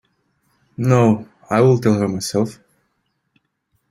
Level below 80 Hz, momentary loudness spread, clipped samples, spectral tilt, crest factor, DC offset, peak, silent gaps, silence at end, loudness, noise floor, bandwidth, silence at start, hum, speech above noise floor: -54 dBFS; 9 LU; under 0.1%; -7 dB/octave; 18 dB; under 0.1%; -2 dBFS; none; 1.35 s; -17 LUFS; -70 dBFS; 15.5 kHz; 0.8 s; none; 54 dB